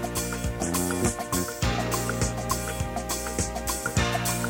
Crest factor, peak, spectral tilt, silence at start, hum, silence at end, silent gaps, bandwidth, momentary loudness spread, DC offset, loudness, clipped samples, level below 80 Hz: 18 dB; -10 dBFS; -4 dB/octave; 0 s; none; 0 s; none; 17 kHz; 4 LU; under 0.1%; -27 LUFS; under 0.1%; -38 dBFS